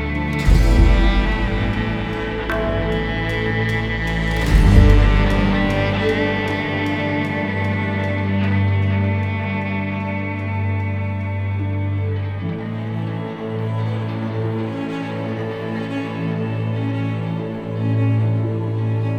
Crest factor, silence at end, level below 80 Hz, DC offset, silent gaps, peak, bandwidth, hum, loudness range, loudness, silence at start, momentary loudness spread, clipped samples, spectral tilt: 18 dB; 0 s; -24 dBFS; under 0.1%; none; 0 dBFS; 10.5 kHz; none; 7 LU; -20 LUFS; 0 s; 9 LU; under 0.1%; -7.5 dB/octave